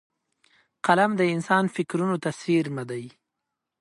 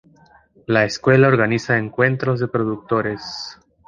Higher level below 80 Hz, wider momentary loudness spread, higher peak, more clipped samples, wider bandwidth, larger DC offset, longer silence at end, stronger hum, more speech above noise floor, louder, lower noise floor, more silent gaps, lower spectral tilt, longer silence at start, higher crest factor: second, -72 dBFS vs -56 dBFS; about the same, 13 LU vs 15 LU; about the same, -4 dBFS vs -2 dBFS; neither; first, 11.5 kHz vs 7.4 kHz; neither; first, 0.7 s vs 0.35 s; neither; first, 60 dB vs 34 dB; second, -24 LUFS vs -18 LUFS; first, -84 dBFS vs -52 dBFS; neither; about the same, -6 dB/octave vs -6.5 dB/octave; first, 0.85 s vs 0.7 s; about the same, 22 dB vs 18 dB